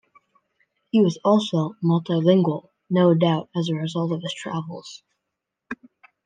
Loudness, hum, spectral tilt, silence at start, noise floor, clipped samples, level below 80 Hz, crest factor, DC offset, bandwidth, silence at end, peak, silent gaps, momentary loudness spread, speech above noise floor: -22 LUFS; none; -7.5 dB/octave; 0.95 s; -82 dBFS; under 0.1%; -72 dBFS; 18 dB; under 0.1%; 9.2 kHz; 0.5 s; -4 dBFS; none; 19 LU; 61 dB